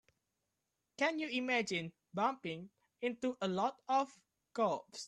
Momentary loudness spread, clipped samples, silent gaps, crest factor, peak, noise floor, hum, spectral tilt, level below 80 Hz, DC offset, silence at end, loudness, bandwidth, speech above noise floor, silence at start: 11 LU; under 0.1%; none; 18 dB; -20 dBFS; -87 dBFS; none; -4.5 dB/octave; -82 dBFS; under 0.1%; 0 s; -37 LUFS; 11.5 kHz; 50 dB; 1 s